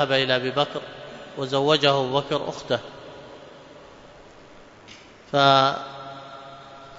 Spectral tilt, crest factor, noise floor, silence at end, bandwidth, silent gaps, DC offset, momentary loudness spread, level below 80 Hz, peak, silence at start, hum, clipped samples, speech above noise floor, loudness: -5 dB/octave; 22 dB; -47 dBFS; 0 s; 7.8 kHz; none; under 0.1%; 24 LU; -62 dBFS; -2 dBFS; 0 s; none; under 0.1%; 25 dB; -22 LUFS